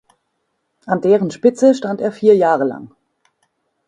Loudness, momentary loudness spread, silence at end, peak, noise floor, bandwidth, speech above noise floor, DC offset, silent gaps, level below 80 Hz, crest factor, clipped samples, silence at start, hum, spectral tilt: -15 LUFS; 9 LU; 1 s; 0 dBFS; -70 dBFS; 9.8 kHz; 56 dB; under 0.1%; none; -62 dBFS; 16 dB; under 0.1%; 0.85 s; none; -6.5 dB/octave